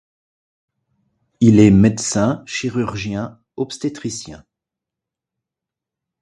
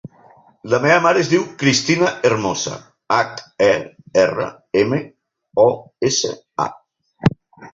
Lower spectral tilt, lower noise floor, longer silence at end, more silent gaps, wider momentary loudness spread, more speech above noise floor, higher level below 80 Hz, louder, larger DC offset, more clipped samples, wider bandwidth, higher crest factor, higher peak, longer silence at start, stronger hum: first, -6 dB/octave vs -4.5 dB/octave; first, -86 dBFS vs -50 dBFS; first, 1.85 s vs 0.05 s; neither; first, 17 LU vs 11 LU; first, 69 dB vs 33 dB; first, -44 dBFS vs -52 dBFS; about the same, -17 LUFS vs -18 LUFS; neither; neither; first, 11.5 kHz vs 7.8 kHz; about the same, 18 dB vs 18 dB; about the same, 0 dBFS vs -2 dBFS; first, 1.4 s vs 0.05 s; neither